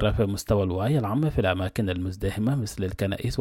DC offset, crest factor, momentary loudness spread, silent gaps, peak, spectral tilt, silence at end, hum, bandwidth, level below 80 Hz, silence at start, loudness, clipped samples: under 0.1%; 16 dB; 5 LU; none; -10 dBFS; -6.5 dB/octave; 0 s; none; 16.5 kHz; -40 dBFS; 0 s; -26 LUFS; under 0.1%